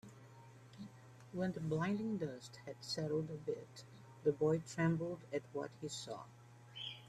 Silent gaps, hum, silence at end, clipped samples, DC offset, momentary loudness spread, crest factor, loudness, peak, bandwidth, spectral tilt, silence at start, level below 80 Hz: none; none; 0 s; under 0.1%; under 0.1%; 22 LU; 20 dB; -41 LUFS; -22 dBFS; 13 kHz; -6 dB/octave; 0.05 s; -76 dBFS